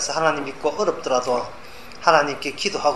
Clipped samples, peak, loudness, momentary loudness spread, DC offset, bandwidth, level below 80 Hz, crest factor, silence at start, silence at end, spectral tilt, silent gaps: under 0.1%; 0 dBFS; -21 LUFS; 13 LU; 1%; 13 kHz; -56 dBFS; 22 dB; 0 s; 0 s; -2.5 dB/octave; none